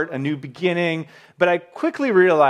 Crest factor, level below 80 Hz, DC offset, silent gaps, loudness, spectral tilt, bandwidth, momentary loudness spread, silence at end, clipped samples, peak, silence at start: 16 dB; -74 dBFS; under 0.1%; none; -21 LUFS; -7 dB/octave; 9.4 kHz; 10 LU; 0 s; under 0.1%; -2 dBFS; 0 s